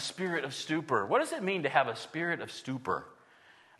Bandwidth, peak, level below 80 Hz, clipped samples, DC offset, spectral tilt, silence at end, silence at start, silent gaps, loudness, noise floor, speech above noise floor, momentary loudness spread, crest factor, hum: 12.5 kHz; -10 dBFS; -78 dBFS; under 0.1%; under 0.1%; -4.5 dB/octave; 0.65 s; 0 s; none; -32 LUFS; -60 dBFS; 28 dB; 8 LU; 24 dB; none